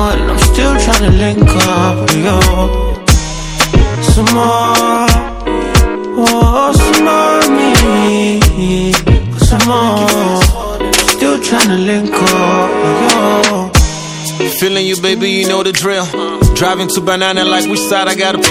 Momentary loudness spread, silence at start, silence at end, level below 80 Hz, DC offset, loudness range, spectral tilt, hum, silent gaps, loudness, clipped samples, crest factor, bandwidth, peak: 5 LU; 0 s; 0 s; -16 dBFS; under 0.1%; 2 LU; -4.5 dB/octave; none; none; -10 LUFS; 0.6%; 10 dB; over 20 kHz; 0 dBFS